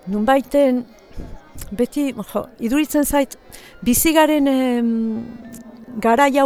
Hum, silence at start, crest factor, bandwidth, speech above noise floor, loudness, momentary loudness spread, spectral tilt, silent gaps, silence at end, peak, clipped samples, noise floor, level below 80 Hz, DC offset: none; 0.05 s; 18 dB; over 20 kHz; 19 dB; -18 LUFS; 23 LU; -4 dB/octave; none; 0 s; 0 dBFS; under 0.1%; -37 dBFS; -40 dBFS; under 0.1%